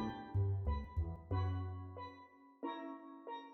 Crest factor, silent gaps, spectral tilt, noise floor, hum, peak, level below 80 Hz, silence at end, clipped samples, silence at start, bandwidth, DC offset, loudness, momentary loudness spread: 14 dB; none; -7.5 dB/octave; -61 dBFS; none; -28 dBFS; -50 dBFS; 0 s; under 0.1%; 0 s; 4.2 kHz; under 0.1%; -43 LUFS; 13 LU